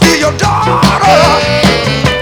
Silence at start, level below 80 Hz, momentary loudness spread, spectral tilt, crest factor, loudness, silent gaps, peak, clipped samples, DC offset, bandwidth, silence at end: 0 s; -26 dBFS; 4 LU; -4.5 dB/octave; 8 dB; -8 LUFS; none; 0 dBFS; 1%; under 0.1%; over 20 kHz; 0 s